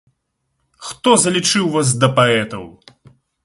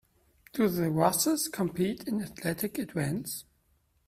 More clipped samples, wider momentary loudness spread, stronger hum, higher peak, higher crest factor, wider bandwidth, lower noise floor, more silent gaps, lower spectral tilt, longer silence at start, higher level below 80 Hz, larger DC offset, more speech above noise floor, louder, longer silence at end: neither; first, 19 LU vs 10 LU; neither; first, 0 dBFS vs -8 dBFS; about the same, 18 dB vs 22 dB; second, 11.5 kHz vs 16 kHz; about the same, -71 dBFS vs -70 dBFS; neither; about the same, -3.5 dB/octave vs -4.5 dB/octave; first, 0.8 s vs 0.55 s; first, -54 dBFS vs -62 dBFS; neither; first, 56 dB vs 41 dB; first, -15 LUFS vs -30 LUFS; about the same, 0.75 s vs 0.65 s